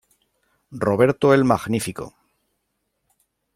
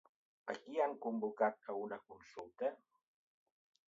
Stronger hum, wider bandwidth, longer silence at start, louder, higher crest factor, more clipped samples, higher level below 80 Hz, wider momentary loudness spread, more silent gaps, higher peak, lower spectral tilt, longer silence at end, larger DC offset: neither; first, 16 kHz vs 7.4 kHz; first, 0.7 s vs 0.45 s; first, -19 LUFS vs -41 LUFS; about the same, 20 dB vs 22 dB; neither; first, -56 dBFS vs -88 dBFS; first, 21 LU vs 15 LU; neither; first, -2 dBFS vs -22 dBFS; first, -6.5 dB/octave vs -4 dB/octave; first, 1.45 s vs 1.1 s; neither